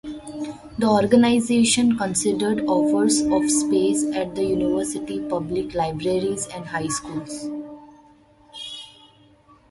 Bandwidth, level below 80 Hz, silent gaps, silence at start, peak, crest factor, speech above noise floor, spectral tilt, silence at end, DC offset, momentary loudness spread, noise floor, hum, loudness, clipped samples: 11.5 kHz; -52 dBFS; none; 0.05 s; -4 dBFS; 18 dB; 33 dB; -4 dB/octave; 0.8 s; under 0.1%; 16 LU; -53 dBFS; none; -21 LUFS; under 0.1%